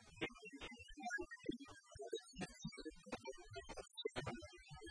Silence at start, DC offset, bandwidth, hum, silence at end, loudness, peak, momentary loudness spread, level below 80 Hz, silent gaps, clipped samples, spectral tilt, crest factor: 0 s; under 0.1%; 10.5 kHz; none; 0 s; -51 LUFS; -30 dBFS; 8 LU; -68 dBFS; none; under 0.1%; -4 dB/octave; 20 dB